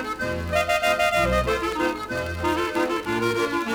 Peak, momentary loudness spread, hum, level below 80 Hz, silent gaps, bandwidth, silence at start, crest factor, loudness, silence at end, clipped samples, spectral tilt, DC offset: -10 dBFS; 7 LU; none; -40 dBFS; none; over 20 kHz; 0 s; 14 dB; -23 LUFS; 0 s; under 0.1%; -4.5 dB/octave; under 0.1%